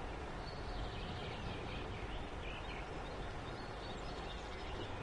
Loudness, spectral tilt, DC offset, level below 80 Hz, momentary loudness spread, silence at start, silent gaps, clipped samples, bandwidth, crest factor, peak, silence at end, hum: -46 LUFS; -5.5 dB/octave; under 0.1%; -50 dBFS; 2 LU; 0 s; none; under 0.1%; 11 kHz; 12 dB; -32 dBFS; 0 s; none